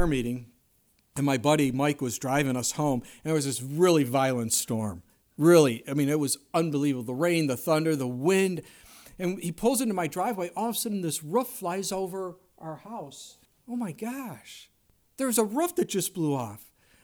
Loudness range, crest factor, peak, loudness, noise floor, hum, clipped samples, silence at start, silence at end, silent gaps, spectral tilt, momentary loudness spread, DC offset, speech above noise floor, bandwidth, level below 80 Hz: 9 LU; 20 dB; -8 dBFS; -27 LUFS; -67 dBFS; none; under 0.1%; 0 s; 0.4 s; none; -5 dB/octave; 16 LU; under 0.1%; 40 dB; over 20 kHz; -54 dBFS